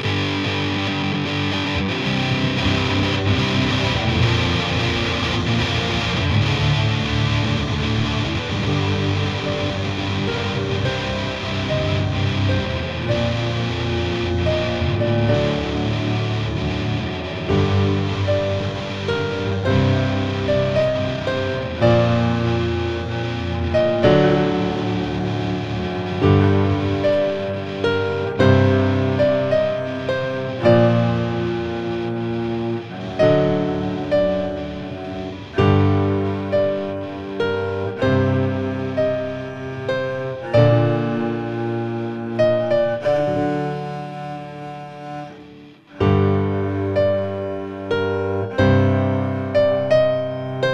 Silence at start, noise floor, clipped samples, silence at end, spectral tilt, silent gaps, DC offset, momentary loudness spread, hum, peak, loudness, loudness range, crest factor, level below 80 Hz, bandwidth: 0 s; -42 dBFS; under 0.1%; 0 s; -7 dB/octave; none; under 0.1%; 9 LU; none; -2 dBFS; -20 LUFS; 3 LU; 18 dB; -38 dBFS; 7.8 kHz